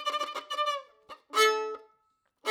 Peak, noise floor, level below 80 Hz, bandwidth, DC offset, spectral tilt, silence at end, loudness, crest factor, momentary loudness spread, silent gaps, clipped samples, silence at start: -10 dBFS; -74 dBFS; -86 dBFS; over 20 kHz; under 0.1%; 2 dB/octave; 0 s; -29 LUFS; 20 dB; 16 LU; none; under 0.1%; 0 s